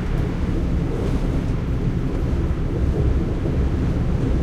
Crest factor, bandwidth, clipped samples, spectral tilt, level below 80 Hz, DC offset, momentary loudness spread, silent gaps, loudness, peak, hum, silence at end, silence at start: 12 dB; 9 kHz; under 0.1%; -8.5 dB/octave; -24 dBFS; under 0.1%; 2 LU; none; -23 LUFS; -8 dBFS; none; 0 s; 0 s